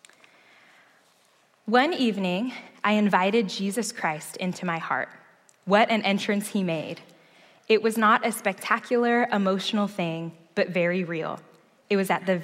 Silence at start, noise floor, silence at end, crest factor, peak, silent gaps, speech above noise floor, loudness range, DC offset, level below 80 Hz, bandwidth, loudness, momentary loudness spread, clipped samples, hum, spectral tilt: 1.65 s; -63 dBFS; 0 s; 20 dB; -6 dBFS; none; 38 dB; 2 LU; under 0.1%; -80 dBFS; 16 kHz; -25 LUFS; 11 LU; under 0.1%; none; -5 dB/octave